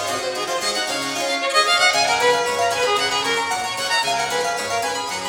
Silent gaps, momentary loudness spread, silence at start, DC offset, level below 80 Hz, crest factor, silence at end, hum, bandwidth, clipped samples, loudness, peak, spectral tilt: none; 7 LU; 0 s; under 0.1%; -58 dBFS; 16 dB; 0 s; none; 19.5 kHz; under 0.1%; -19 LUFS; -4 dBFS; -0.5 dB/octave